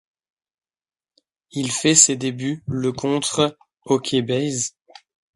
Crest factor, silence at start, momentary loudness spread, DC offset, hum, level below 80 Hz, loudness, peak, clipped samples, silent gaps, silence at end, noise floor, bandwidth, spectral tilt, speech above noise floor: 22 dB; 1.55 s; 14 LU; under 0.1%; none; -58 dBFS; -20 LUFS; 0 dBFS; under 0.1%; none; 0.65 s; under -90 dBFS; 11.5 kHz; -3 dB/octave; over 70 dB